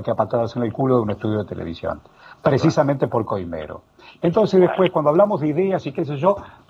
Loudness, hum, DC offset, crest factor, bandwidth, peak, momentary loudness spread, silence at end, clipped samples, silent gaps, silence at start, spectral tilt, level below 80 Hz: -20 LUFS; none; under 0.1%; 18 dB; 7.6 kHz; -2 dBFS; 13 LU; 0.2 s; under 0.1%; none; 0 s; -8 dB/octave; -52 dBFS